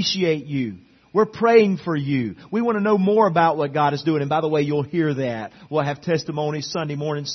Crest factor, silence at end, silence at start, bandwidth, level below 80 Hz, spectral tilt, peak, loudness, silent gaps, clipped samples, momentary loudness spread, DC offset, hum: 18 dB; 0 s; 0 s; 6.4 kHz; -62 dBFS; -6 dB/octave; -2 dBFS; -21 LUFS; none; under 0.1%; 10 LU; under 0.1%; none